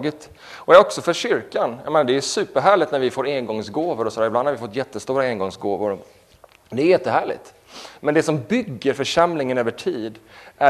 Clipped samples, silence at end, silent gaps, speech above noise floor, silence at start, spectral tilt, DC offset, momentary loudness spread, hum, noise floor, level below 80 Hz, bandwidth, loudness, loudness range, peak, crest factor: under 0.1%; 0 s; none; 31 dB; 0 s; -4.5 dB/octave; under 0.1%; 13 LU; none; -51 dBFS; -60 dBFS; 13.5 kHz; -20 LUFS; 5 LU; 0 dBFS; 20 dB